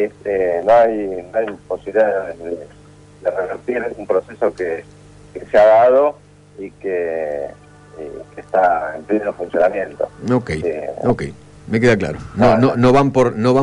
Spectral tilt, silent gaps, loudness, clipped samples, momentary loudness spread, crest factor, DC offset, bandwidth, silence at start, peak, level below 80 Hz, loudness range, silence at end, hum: -7.5 dB/octave; none; -17 LUFS; under 0.1%; 16 LU; 14 dB; under 0.1%; 11 kHz; 0 s; -4 dBFS; -44 dBFS; 5 LU; 0 s; 50 Hz at -45 dBFS